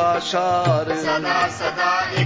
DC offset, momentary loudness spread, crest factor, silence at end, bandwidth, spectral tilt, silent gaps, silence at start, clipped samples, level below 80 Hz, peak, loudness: under 0.1%; 2 LU; 14 dB; 0 s; 8 kHz; -5 dB/octave; none; 0 s; under 0.1%; -52 dBFS; -6 dBFS; -20 LUFS